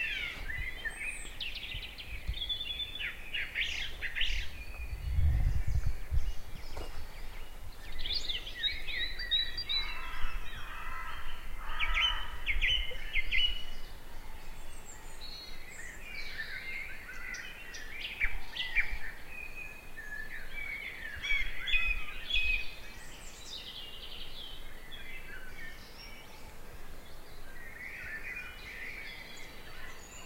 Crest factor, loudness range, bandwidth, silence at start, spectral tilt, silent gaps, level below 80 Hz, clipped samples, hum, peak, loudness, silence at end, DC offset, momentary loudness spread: 20 dB; 12 LU; 16 kHz; 0 s; -2.5 dB/octave; none; -40 dBFS; under 0.1%; none; -14 dBFS; -36 LUFS; 0 s; under 0.1%; 18 LU